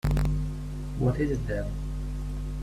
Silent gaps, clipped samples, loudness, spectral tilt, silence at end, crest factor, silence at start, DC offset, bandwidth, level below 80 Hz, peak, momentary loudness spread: none; under 0.1%; -31 LUFS; -8 dB/octave; 0 s; 14 dB; 0.05 s; under 0.1%; 14.5 kHz; -32 dBFS; -14 dBFS; 8 LU